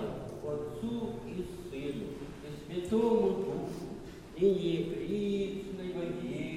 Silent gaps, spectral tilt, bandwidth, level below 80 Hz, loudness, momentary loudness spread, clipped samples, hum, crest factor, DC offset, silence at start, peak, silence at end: none; -7 dB/octave; 15 kHz; -56 dBFS; -35 LUFS; 14 LU; under 0.1%; none; 18 dB; under 0.1%; 0 s; -16 dBFS; 0 s